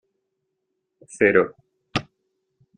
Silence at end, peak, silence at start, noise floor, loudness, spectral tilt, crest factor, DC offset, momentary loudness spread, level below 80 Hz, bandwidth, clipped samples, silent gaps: 0.75 s; -2 dBFS; 1.15 s; -78 dBFS; -22 LUFS; -5.5 dB/octave; 24 dB; under 0.1%; 11 LU; -62 dBFS; 9.8 kHz; under 0.1%; none